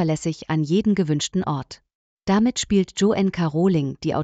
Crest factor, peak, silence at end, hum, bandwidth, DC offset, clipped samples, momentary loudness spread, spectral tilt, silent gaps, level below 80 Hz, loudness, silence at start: 14 dB; -8 dBFS; 0 s; none; 9 kHz; under 0.1%; under 0.1%; 7 LU; -6 dB/octave; 1.95-2.17 s; -50 dBFS; -22 LUFS; 0 s